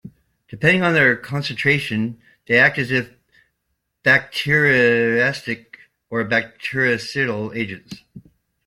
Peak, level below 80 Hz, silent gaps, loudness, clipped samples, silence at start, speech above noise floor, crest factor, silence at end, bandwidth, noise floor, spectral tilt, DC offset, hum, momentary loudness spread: -2 dBFS; -58 dBFS; none; -18 LUFS; under 0.1%; 0.05 s; 55 dB; 18 dB; 0.45 s; 16 kHz; -74 dBFS; -5.5 dB/octave; under 0.1%; none; 14 LU